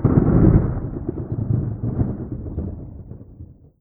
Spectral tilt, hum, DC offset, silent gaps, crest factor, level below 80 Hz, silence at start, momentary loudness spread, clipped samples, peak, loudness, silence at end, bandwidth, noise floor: -15 dB/octave; none; under 0.1%; none; 18 dB; -28 dBFS; 0 s; 24 LU; under 0.1%; -2 dBFS; -21 LUFS; 0.3 s; 2.4 kHz; -42 dBFS